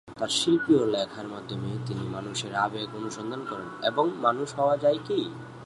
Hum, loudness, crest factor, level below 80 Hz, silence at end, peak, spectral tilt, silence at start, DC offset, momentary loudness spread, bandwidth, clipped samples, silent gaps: none; -28 LUFS; 18 dB; -64 dBFS; 0 s; -10 dBFS; -4.5 dB/octave; 0.05 s; under 0.1%; 11 LU; 11.5 kHz; under 0.1%; none